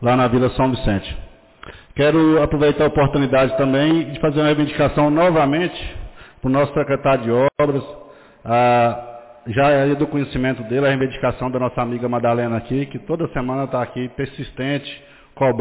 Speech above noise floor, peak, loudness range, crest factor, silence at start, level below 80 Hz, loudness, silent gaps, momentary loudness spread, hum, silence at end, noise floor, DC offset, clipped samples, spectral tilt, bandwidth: 23 dB; -8 dBFS; 6 LU; 12 dB; 0 s; -38 dBFS; -18 LUFS; none; 12 LU; none; 0 s; -41 dBFS; under 0.1%; under 0.1%; -11 dB/octave; 4 kHz